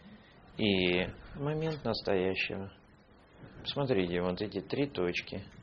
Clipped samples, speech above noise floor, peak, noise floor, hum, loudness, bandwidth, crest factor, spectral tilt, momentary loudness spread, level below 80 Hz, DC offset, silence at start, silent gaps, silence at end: under 0.1%; 27 dB; -12 dBFS; -60 dBFS; none; -33 LUFS; 6.8 kHz; 22 dB; -4 dB/octave; 13 LU; -58 dBFS; under 0.1%; 0 s; none; 0 s